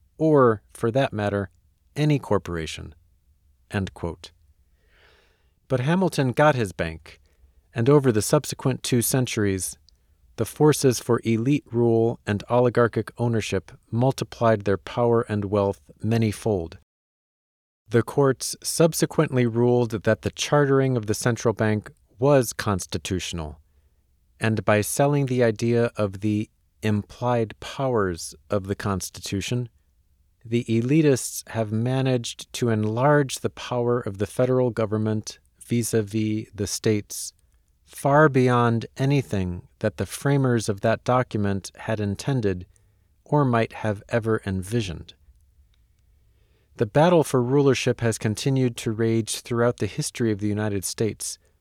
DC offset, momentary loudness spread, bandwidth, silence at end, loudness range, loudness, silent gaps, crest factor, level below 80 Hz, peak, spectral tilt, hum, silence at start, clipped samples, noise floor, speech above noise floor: under 0.1%; 11 LU; 16.5 kHz; 0.25 s; 5 LU; -23 LUFS; 16.83-17.85 s; 18 dB; -52 dBFS; -6 dBFS; -6 dB/octave; none; 0.2 s; under 0.1%; -63 dBFS; 40 dB